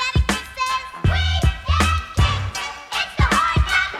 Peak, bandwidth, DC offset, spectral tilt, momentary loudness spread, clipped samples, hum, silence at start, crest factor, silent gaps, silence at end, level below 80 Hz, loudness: -2 dBFS; 14.5 kHz; under 0.1%; -4 dB/octave; 7 LU; under 0.1%; none; 0 s; 16 dB; none; 0 s; -24 dBFS; -20 LUFS